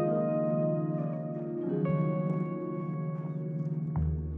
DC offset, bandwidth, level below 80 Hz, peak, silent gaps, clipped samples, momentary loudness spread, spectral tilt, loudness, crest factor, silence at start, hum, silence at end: under 0.1%; 3 kHz; -48 dBFS; -18 dBFS; none; under 0.1%; 6 LU; -12.5 dB/octave; -32 LUFS; 12 dB; 0 s; none; 0 s